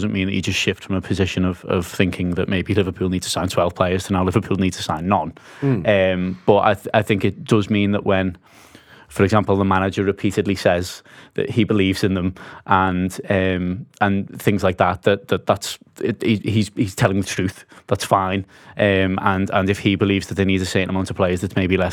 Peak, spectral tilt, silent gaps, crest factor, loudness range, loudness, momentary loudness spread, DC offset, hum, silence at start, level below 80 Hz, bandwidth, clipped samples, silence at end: 0 dBFS; -6 dB/octave; none; 20 dB; 2 LU; -20 LUFS; 7 LU; under 0.1%; none; 0 s; -48 dBFS; 15.5 kHz; under 0.1%; 0 s